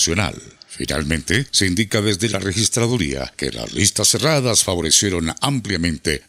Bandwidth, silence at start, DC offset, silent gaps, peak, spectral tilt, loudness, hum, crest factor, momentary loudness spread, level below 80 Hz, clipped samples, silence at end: 16 kHz; 0 s; under 0.1%; none; 0 dBFS; -3 dB/octave; -18 LUFS; none; 18 dB; 10 LU; -40 dBFS; under 0.1%; 0.1 s